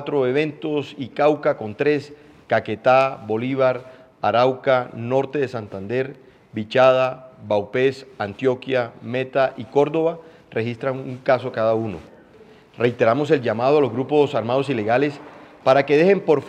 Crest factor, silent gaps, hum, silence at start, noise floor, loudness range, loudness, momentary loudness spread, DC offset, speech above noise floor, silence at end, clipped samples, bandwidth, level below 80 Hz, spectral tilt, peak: 20 dB; none; none; 0 s; -48 dBFS; 3 LU; -21 LUFS; 10 LU; under 0.1%; 28 dB; 0 s; under 0.1%; 9 kHz; -64 dBFS; -7 dB/octave; -2 dBFS